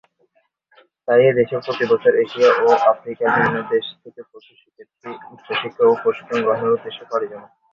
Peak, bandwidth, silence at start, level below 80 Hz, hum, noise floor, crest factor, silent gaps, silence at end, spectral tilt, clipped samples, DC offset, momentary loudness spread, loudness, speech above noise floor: -2 dBFS; 7 kHz; 1.1 s; -62 dBFS; none; -64 dBFS; 18 dB; none; 0.3 s; -6 dB/octave; under 0.1%; under 0.1%; 18 LU; -18 LUFS; 45 dB